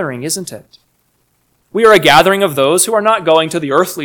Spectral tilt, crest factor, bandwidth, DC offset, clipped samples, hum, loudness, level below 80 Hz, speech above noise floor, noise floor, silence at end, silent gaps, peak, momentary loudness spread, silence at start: -3 dB/octave; 12 dB; over 20 kHz; under 0.1%; 0.8%; none; -11 LUFS; -50 dBFS; 48 dB; -60 dBFS; 0 s; none; 0 dBFS; 13 LU; 0 s